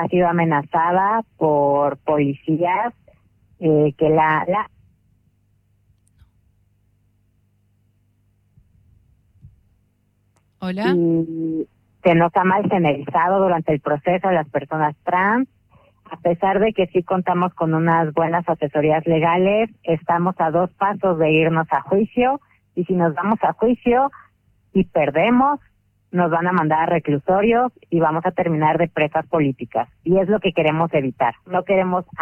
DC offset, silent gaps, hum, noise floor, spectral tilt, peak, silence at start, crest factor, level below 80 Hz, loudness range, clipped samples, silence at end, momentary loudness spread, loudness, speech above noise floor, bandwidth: under 0.1%; none; 50 Hz at -50 dBFS; -63 dBFS; -9.5 dB/octave; -4 dBFS; 0 s; 16 dB; -52 dBFS; 3 LU; under 0.1%; 0 s; 7 LU; -19 LUFS; 45 dB; 5.6 kHz